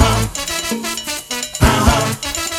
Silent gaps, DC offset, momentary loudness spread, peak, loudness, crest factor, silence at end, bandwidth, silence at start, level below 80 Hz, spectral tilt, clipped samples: none; under 0.1%; 9 LU; 0 dBFS; -17 LUFS; 16 dB; 0 s; 17.5 kHz; 0 s; -26 dBFS; -3.5 dB/octave; under 0.1%